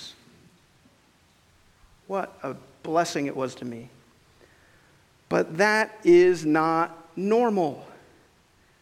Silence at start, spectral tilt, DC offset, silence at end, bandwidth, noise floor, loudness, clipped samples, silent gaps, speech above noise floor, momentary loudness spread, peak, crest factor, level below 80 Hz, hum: 0 s; -5.5 dB/octave; under 0.1%; 0.9 s; 13 kHz; -61 dBFS; -24 LUFS; under 0.1%; none; 38 dB; 19 LU; -6 dBFS; 20 dB; -68 dBFS; none